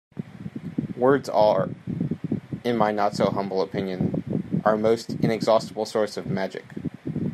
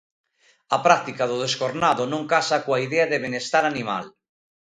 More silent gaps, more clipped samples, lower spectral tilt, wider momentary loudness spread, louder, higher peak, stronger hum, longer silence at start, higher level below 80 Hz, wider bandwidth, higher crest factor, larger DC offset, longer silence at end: neither; neither; first, -7 dB/octave vs -4 dB/octave; first, 12 LU vs 8 LU; second, -25 LUFS vs -22 LUFS; second, -6 dBFS vs 0 dBFS; neither; second, 0.15 s vs 0.7 s; first, -60 dBFS vs -66 dBFS; first, 13.5 kHz vs 10.5 kHz; about the same, 20 dB vs 22 dB; neither; second, 0 s vs 0.6 s